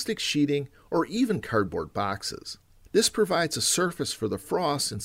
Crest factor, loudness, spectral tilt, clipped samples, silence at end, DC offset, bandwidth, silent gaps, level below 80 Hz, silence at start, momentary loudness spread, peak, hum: 18 dB; -26 LUFS; -3.5 dB/octave; under 0.1%; 0 s; under 0.1%; 16 kHz; none; -56 dBFS; 0 s; 8 LU; -10 dBFS; none